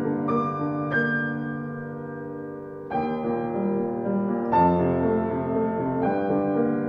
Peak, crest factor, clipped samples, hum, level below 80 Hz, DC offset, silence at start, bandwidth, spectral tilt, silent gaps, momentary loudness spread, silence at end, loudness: -8 dBFS; 16 dB; under 0.1%; none; -56 dBFS; under 0.1%; 0 s; 5.2 kHz; -10 dB/octave; none; 13 LU; 0 s; -25 LUFS